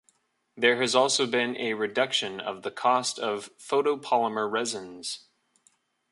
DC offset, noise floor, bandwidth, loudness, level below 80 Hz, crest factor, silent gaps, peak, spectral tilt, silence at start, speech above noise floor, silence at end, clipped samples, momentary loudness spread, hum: under 0.1%; -69 dBFS; 11.5 kHz; -26 LUFS; -76 dBFS; 22 dB; none; -6 dBFS; -2 dB/octave; 0.55 s; 42 dB; 0.95 s; under 0.1%; 12 LU; none